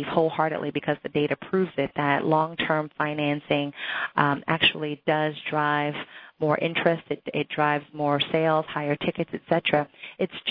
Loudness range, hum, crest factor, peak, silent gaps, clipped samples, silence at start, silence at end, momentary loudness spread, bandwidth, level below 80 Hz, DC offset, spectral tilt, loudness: 1 LU; none; 22 dB; -4 dBFS; none; under 0.1%; 0 s; 0 s; 7 LU; 5.2 kHz; -64 dBFS; under 0.1%; -8.5 dB/octave; -25 LUFS